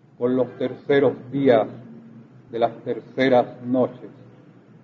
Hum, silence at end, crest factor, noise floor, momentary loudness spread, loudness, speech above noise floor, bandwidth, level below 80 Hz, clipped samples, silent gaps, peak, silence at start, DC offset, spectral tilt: none; 0.75 s; 18 dB; -49 dBFS; 14 LU; -22 LUFS; 27 dB; 6.4 kHz; -68 dBFS; under 0.1%; none; -4 dBFS; 0.2 s; under 0.1%; -8.5 dB/octave